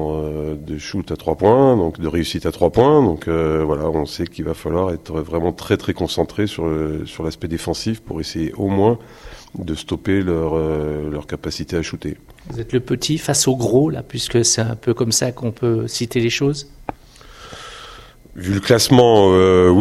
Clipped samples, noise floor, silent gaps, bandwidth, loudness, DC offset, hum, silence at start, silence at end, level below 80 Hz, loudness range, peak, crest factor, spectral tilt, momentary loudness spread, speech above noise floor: under 0.1%; -41 dBFS; none; 15 kHz; -18 LUFS; under 0.1%; none; 0 s; 0 s; -40 dBFS; 6 LU; 0 dBFS; 18 dB; -5 dB/octave; 15 LU; 24 dB